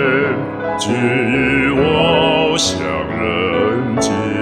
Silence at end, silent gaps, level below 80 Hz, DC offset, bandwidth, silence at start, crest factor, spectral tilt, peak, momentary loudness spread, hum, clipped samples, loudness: 0 s; none; -40 dBFS; 0.1%; 13.5 kHz; 0 s; 14 dB; -4.5 dB/octave; 0 dBFS; 7 LU; none; under 0.1%; -15 LUFS